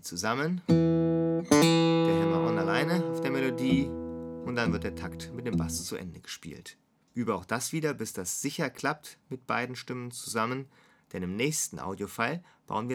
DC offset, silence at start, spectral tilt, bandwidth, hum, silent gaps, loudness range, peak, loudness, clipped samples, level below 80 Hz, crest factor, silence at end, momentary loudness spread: under 0.1%; 0.05 s; -5 dB/octave; 17.5 kHz; none; none; 9 LU; -6 dBFS; -29 LUFS; under 0.1%; -56 dBFS; 22 dB; 0 s; 16 LU